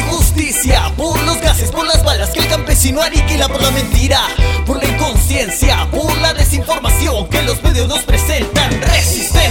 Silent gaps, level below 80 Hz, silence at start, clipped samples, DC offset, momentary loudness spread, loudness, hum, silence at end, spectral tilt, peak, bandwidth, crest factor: none; -16 dBFS; 0 s; under 0.1%; under 0.1%; 3 LU; -13 LUFS; none; 0 s; -3.5 dB/octave; 0 dBFS; 18 kHz; 12 dB